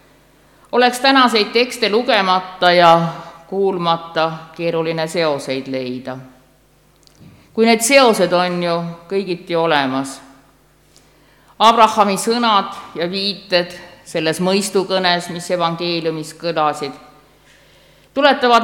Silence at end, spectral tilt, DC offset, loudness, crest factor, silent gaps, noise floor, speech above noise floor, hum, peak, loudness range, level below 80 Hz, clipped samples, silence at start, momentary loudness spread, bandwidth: 0 s; -4 dB/octave; under 0.1%; -16 LUFS; 18 dB; none; -53 dBFS; 37 dB; none; 0 dBFS; 7 LU; -58 dBFS; under 0.1%; 0.75 s; 15 LU; 18.5 kHz